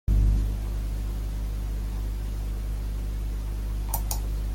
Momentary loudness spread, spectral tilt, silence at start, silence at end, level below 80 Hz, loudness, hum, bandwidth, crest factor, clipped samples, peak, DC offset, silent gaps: 7 LU; -6 dB/octave; 0.1 s; 0 s; -28 dBFS; -31 LUFS; 50 Hz at -30 dBFS; 16.5 kHz; 14 dB; under 0.1%; -12 dBFS; under 0.1%; none